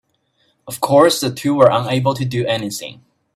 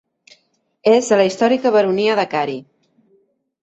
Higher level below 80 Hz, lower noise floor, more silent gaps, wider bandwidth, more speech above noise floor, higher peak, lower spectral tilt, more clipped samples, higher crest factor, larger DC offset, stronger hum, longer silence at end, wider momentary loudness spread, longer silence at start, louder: first, -56 dBFS vs -66 dBFS; about the same, -63 dBFS vs -63 dBFS; neither; first, 16 kHz vs 8.2 kHz; about the same, 47 dB vs 48 dB; about the same, 0 dBFS vs -2 dBFS; about the same, -5 dB/octave vs -4.5 dB/octave; neither; about the same, 18 dB vs 16 dB; neither; neither; second, 0.4 s vs 1 s; first, 15 LU vs 8 LU; second, 0.65 s vs 0.85 s; about the same, -16 LUFS vs -16 LUFS